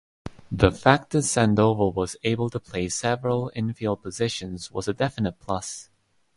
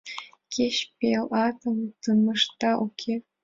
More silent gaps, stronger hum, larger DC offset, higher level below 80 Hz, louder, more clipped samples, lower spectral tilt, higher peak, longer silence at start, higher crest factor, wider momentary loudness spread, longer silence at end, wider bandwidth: neither; neither; neither; first, -44 dBFS vs -66 dBFS; about the same, -24 LUFS vs -26 LUFS; neither; about the same, -5 dB/octave vs -4.5 dB/octave; first, -2 dBFS vs -10 dBFS; first, 0.25 s vs 0.05 s; first, 24 dB vs 16 dB; first, 12 LU vs 9 LU; first, 0.55 s vs 0.2 s; first, 11.5 kHz vs 7.8 kHz